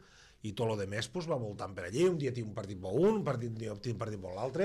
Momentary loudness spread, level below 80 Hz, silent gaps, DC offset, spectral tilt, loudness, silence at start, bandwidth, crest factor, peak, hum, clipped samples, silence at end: 11 LU; -62 dBFS; none; under 0.1%; -6.5 dB/octave; -35 LUFS; 0.15 s; 12.5 kHz; 16 dB; -18 dBFS; none; under 0.1%; 0 s